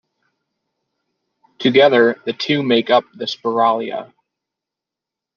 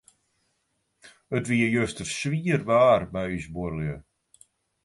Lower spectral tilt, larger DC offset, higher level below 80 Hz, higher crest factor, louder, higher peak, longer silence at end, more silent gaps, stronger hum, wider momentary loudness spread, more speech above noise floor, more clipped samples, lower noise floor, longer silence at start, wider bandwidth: about the same, -5.5 dB/octave vs -6 dB/octave; neither; second, -68 dBFS vs -52 dBFS; about the same, 18 dB vs 20 dB; first, -16 LUFS vs -25 LUFS; first, -2 dBFS vs -8 dBFS; first, 1.3 s vs 0.85 s; neither; neither; about the same, 12 LU vs 13 LU; first, 69 dB vs 50 dB; neither; first, -85 dBFS vs -75 dBFS; first, 1.6 s vs 1.05 s; second, 7 kHz vs 11.5 kHz